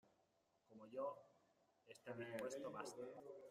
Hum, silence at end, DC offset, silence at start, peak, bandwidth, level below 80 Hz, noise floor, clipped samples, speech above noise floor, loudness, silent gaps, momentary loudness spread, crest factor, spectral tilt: none; 0 s; under 0.1%; 0.05 s; -36 dBFS; 15.5 kHz; under -90 dBFS; -83 dBFS; under 0.1%; 31 dB; -52 LUFS; none; 15 LU; 20 dB; -4.5 dB/octave